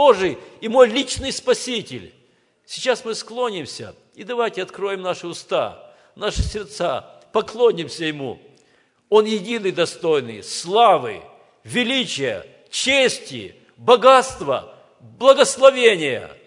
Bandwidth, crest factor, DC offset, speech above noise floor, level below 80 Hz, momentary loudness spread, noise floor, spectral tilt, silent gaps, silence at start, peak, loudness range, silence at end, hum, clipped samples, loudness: 11 kHz; 20 dB; under 0.1%; 41 dB; -42 dBFS; 17 LU; -60 dBFS; -3.5 dB/octave; none; 0 s; 0 dBFS; 9 LU; 0.15 s; none; under 0.1%; -19 LUFS